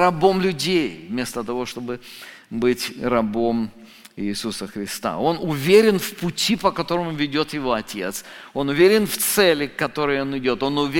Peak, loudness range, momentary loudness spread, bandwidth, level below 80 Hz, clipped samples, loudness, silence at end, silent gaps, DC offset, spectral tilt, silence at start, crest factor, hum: -4 dBFS; 5 LU; 14 LU; 17 kHz; -50 dBFS; under 0.1%; -21 LUFS; 0 s; none; under 0.1%; -4.5 dB/octave; 0 s; 18 dB; none